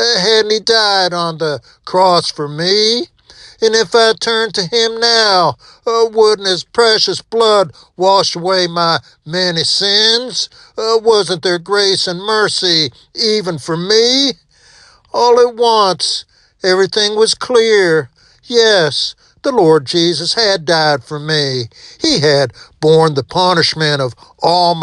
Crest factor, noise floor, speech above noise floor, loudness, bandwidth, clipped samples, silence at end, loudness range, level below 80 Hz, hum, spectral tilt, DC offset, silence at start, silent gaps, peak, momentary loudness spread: 14 dB; -45 dBFS; 32 dB; -12 LUFS; 11 kHz; under 0.1%; 0 s; 1 LU; -54 dBFS; none; -3 dB/octave; under 0.1%; 0 s; none; 0 dBFS; 9 LU